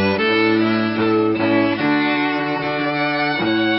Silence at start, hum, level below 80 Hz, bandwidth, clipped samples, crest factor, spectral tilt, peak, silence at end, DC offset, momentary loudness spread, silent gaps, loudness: 0 s; none; -52 dBFS; 5.8 kHz; under 0.1%; 12 dB; -9.5 dB/octave; -6 dBFS; 0 s; under 0.1%; 4 LU; none; -18 LUFS